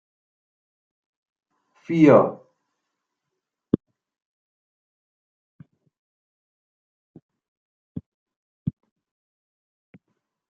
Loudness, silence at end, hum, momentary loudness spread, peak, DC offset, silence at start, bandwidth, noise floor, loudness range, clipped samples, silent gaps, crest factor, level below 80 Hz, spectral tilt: -20 LUFS; 1.8 s; none; 26 LU; -2 dBFS; under 0.1%; 1.9 s; 7.2 kHz; -83 dBFS; 19 LU; under 0.1%; 4.22-5.59 s, 5.99-7.14 s, 7.22-7.29 s, 7.48-7.95 s, 8.06-8.26 s, 8.36-8.66 s; 26 dB; -66 dBFS; -8 dB/octave